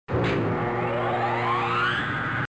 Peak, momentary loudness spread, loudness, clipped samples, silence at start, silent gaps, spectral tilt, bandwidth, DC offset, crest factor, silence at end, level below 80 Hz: -14 dBFS; 3 LU; -25 LUFS; under 0.1%; 0.1 s; none; -7 dB/octave; 8 kHz; 0.2%; 12 dB; 0.05 s; -46 dBFS